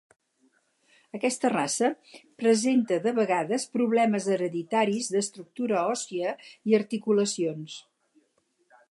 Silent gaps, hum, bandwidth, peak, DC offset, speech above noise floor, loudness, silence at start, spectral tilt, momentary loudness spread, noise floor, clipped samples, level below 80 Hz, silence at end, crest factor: none; none; 11.5 kHz; -10 dBFS; under 0.1%; 45 dB; -27 LUFS; 1.15 s; -4.5 dB/octave; 10 LU; -71 dBFS; under 0.1%; -80 dBFS; 1.1 s; 18 dB